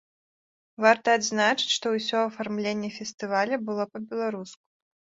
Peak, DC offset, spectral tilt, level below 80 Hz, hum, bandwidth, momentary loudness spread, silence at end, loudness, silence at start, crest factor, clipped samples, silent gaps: -4 dBFS; under 0.1%; -3 dB/octave; -74 dBFS; none; 7.8 kHz; 10 LU; 0.5 s; -26 LUFS; 0.8 s; 24 dB; under 0.1%; 3.14-3.18 s